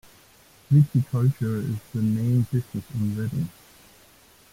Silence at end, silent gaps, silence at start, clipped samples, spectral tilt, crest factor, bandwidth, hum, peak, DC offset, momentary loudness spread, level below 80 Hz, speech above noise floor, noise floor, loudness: 1 s; none; 0.7 s; under 0.1%; -9 dB/octave; 16 dB; 16 kHz; none; -8 dBFS; under 0.1%; 10 LU; -56 dBFS; 31 dB; -54 dBFS; -25 LUFS